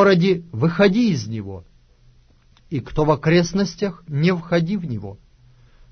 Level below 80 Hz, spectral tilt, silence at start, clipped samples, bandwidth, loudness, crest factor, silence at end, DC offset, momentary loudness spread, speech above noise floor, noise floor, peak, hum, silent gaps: -44 dBFS; -6.5 dB/octave; 0 s; under 0.1%; 6.6 kHz; -20 LUFS; 16 dB; 0.75 s; under 0.1%; 14 LU; 34 dB; -53 dBFS; -4 dBFS; none; none